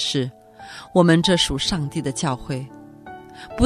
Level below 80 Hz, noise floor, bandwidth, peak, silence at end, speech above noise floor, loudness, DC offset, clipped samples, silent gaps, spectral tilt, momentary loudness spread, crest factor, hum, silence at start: -44 dBFS; -40 dBFS; 13.5 kHz; -2 dBFS; 0 s; 20 dB; -21 LUFS; under 0.1%; under 0.1%; none; -4.5 dB/octave; 24 LU; 20 dB; none; 0 s